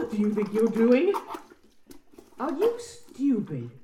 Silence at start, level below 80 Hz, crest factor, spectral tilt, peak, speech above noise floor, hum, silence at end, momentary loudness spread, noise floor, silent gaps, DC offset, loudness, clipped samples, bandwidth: 0 s; -66 dBFS; 18 dB; -7 dB/octave; -10 dBFS; 28 dB; none; 0 s; 18 LU; -53 dBFS; none; under 0.1%; -26 LUFS; under 0.1%; 15 kHz